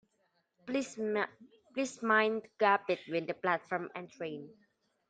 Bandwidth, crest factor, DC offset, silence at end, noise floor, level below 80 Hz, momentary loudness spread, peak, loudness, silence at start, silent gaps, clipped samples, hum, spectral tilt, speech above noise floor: 9.2 kHz; 22 dB; under 0.1%; 0.6 s; -77 dBFS; -82 dBFS; 14 LU; -14 dBFS; -33 LUFS; 0.65 s; none; under 0.1%; none; -4.5 dB/octave; 43 dB